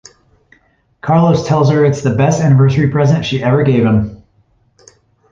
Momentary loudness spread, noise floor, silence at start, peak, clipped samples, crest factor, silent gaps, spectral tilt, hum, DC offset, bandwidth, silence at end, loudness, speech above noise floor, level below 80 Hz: 4 LU; -55 dBFS; 1.05 s; -2 dBFS; under 0.1%; 12 dB; none; -7.5 dB/octave; none; under 0.1%; 7.6 kHz; 1.15 s; -12 LUFS; 44 dB; -40 dBFS